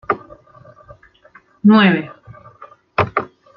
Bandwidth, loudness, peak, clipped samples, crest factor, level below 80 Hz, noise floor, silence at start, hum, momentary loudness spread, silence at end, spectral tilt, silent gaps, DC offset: 5.6 kHz; -16 LUFS; -2 dBFS; under 0.1%; 18 dB; -54 dBFS; -49 dBFS; 0.1 s; none; 13 LU; 0.3 s; -9 dB/octave; none; under 0.1%